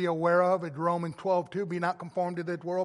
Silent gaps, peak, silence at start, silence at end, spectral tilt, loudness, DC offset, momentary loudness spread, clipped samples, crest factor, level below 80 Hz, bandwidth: none; -12 dBFS; 0 s; 0 s; -7.5 dB/octave; -29 LUFS; under 0.1%; 8 LU; under 0.1%; 16 dB; -74 dBFS; 11.5 kHz